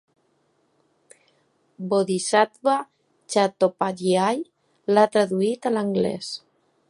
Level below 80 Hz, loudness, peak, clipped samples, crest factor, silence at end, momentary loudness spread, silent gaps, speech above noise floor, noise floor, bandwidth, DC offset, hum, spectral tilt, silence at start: -70 dBFS; -22 LUFS; -4 dBFS; under 0.1%; 20 dB; 0.5 s; 14 LU; none; 45 dB; -67 dBFS; 11.5 kHz; under 0.1%; none; -5 dB/octave; 1.8 s